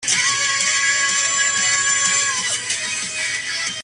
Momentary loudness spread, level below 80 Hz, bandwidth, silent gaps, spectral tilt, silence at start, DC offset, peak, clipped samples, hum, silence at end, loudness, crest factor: 6 LU; -60 dBFS; 13.5 kHz; none; 2 dB/octave; 0 s; under 0.1%; -4 dBFS; under 0.1%; none; 0 s; -17 LUFS; 16 dB